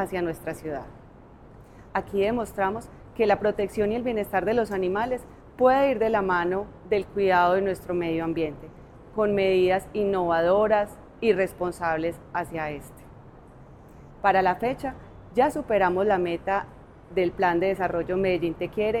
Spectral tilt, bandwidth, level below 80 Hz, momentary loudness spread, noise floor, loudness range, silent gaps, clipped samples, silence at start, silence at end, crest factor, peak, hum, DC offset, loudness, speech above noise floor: -6.5 dB/octave; 14.5 kHz; -50 dBFS; 12 LU; -48 dBFS; 5 LU; none; under 0.1%; 0 s; 0 s; 18 dB; -8 dBFS; none; under 0.1%; -25 LUFS; 24 dB